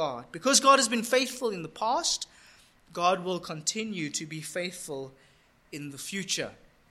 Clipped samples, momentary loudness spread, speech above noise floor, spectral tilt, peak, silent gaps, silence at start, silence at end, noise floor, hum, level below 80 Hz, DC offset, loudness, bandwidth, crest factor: under 0.1%; 19 LU; 29 dB; -2 dB/octave; -6 dBFS; none; 0 s; 0.35 s; -58 dBFS; none; -68 dBFS; under 0.1%; -28 LUFS; 16 kHz; 24 dB